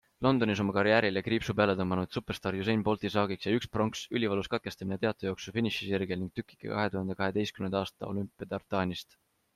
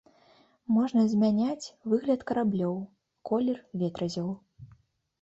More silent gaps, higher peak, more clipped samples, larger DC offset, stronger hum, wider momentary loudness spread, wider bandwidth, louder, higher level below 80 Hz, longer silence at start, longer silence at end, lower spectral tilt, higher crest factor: neither; first, -10 dBFS vs -14 dBFS; neither; neither; neither; second, 9 LU vs 14 LU; first, 14.5 kHz vs 8 kHz; about the same, -31 LUFS vs -29 LUFS; first, -60 dBFS vs -66 dBFS; second, 0.2 s vs 0.7 s; about the same, 0.55 s vs 0.55 s; second, -6 dB/octave vs -7.5 dB/octave; first, 22 dB vs 14 dB